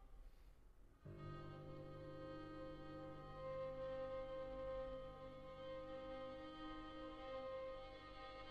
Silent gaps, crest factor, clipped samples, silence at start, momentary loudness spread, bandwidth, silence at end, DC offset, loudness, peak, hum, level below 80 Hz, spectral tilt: none; 12 dB; under 0.1%; 0 s; 7 LU; 8.8 kHz; 0 s; under 0.1%; -53 LUFS; -40 dBFS; none; -64 dBFS; -7 dB/octave